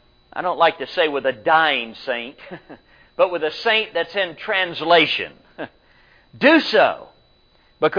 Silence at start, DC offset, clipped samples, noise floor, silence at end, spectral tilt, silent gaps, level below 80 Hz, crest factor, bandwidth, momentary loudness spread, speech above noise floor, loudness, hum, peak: 0.35 s; under 0.1%; under 0.1%; -56 dBFS; 0 s; -5 dB/octave; none; -60 dBFS; 18 dB; 5.2 kHz; 21 LU; 37 dB; -19 LUFS; none; -2 dBFS